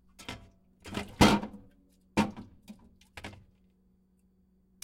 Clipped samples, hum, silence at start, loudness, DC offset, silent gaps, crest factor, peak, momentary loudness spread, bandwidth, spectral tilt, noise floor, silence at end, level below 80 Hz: under 0.1%; none; 0.2 s; -29 LUFS; under 0.1%; none; 26 dB; -8 dBFS; 27 LU; 16 kHz; -5 dB/octave; -67 dBFS; 1.5 s; -48 dBFS